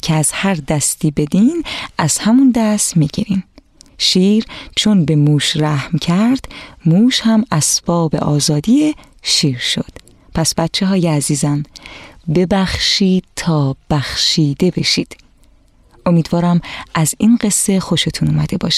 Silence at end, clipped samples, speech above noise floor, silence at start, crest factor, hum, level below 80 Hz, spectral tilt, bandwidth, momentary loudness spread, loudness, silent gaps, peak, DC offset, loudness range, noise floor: 0 s; under 0.1%; 34 dB; 0.05 s; 14 dB; none; -40 dBFS; -4.5 dB/octave; 14.5 kHz; 8 LU; -14 LUFS; none; -2 dBFS; under 0.1%; 2 LU; -49 dBFS